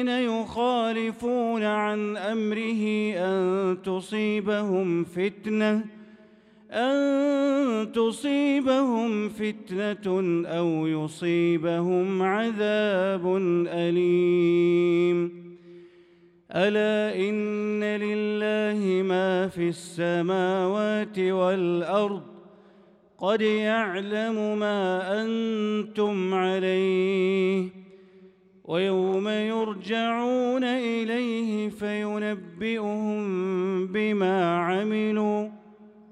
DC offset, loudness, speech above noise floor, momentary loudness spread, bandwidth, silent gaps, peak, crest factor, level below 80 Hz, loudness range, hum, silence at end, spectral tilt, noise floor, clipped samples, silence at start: under 0.1%; -26 LUFS; 32 dB; 6 LU; 11 kHz; none; -10 dBFS; 16 dB; -70 dBFS; 3 LU; none; 0.2 s; -6.5 dB/octave; -56 dBFS; under 0.1%; 0 s